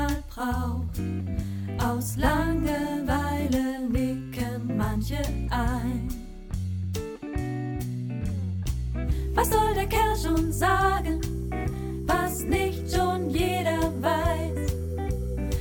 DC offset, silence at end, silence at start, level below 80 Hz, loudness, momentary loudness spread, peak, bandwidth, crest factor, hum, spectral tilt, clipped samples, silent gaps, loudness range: under 0.1%; 0 s; 0 s; -34 dBFS; -28 LUFS; 8 LU; -8 dBFS; 17.5 kHz; 18 dB; none; -6 dB/octave; under 0.1%; none; 5 LU